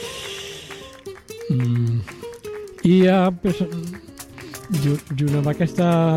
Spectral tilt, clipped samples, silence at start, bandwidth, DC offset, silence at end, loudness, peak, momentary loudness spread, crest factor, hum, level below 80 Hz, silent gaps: -7 dB/octave; under 0.1%; 0 s; 15.5 kHz; under 0.1%; 0 s; -21 LUFS; -6 dBFS; 20 LU; 16 dB; none; -50 dBFS; none